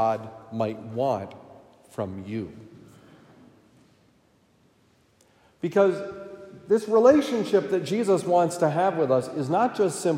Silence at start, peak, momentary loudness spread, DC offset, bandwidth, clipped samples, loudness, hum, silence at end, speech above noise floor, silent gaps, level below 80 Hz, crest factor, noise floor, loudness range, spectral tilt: 0 s; -6 dBFS; 18 LU; under 0.1%; 15.5 kHz; under 0.1%; -24 LUFS; none; 0 s; 39 dB; none; -70 dBFS; 20 dB; -62 dBFS; 17 LU; -6 dB/octave